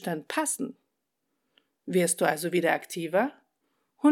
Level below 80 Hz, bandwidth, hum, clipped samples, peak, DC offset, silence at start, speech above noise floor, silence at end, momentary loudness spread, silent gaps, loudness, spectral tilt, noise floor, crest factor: -88 dBFS; 18 kHz; none; under 0.1%; -8 dBFS; under 0.1%; 0 s; 53 dB; 0 s; 8 LU; none; -28 LUFS; -4 dB/octave; -81 dBFS; 20 dB